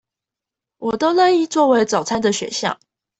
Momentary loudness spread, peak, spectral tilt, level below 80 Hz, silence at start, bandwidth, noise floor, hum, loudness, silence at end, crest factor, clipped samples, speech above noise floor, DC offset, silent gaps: 10 LU; -4 dBFS; -3.5 dB/octave; -58 dBFS; 0.8 s; 8.4 kHz; -86 dBFS; none; -18 LUFS; 0.45 s; 16 dB; under 0.1%; 69 dB; under 0.1%; none